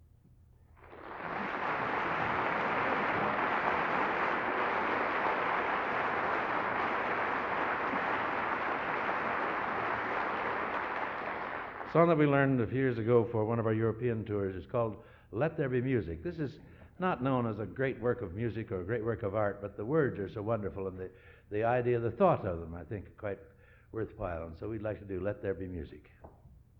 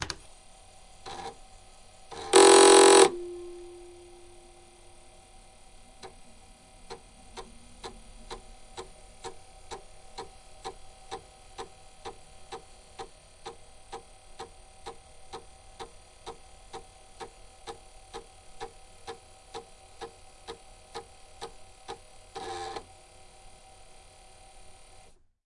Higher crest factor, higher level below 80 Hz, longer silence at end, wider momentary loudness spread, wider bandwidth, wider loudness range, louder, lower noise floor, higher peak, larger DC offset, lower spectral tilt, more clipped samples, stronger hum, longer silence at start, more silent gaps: second, 20 dB vs 26 dB; about the same, -58 dBFS vs -56 dBFS; second, 0.3 s vs 2.65 s; second, 12 LU vs 25 LU; second, 7 kHz vs 11.5 kHz; second, 5 LU vs 26 LU; second, -33 LUFS vs -19 LUFS; first, -61 dBFS vs -56 dBFS; second, -12 dBFS vs -4 dBFS; neither; first, -8.5 dB/octave vs -1.5 dB/octave; neither; neither; first, 0.8 s vs 0 s; neither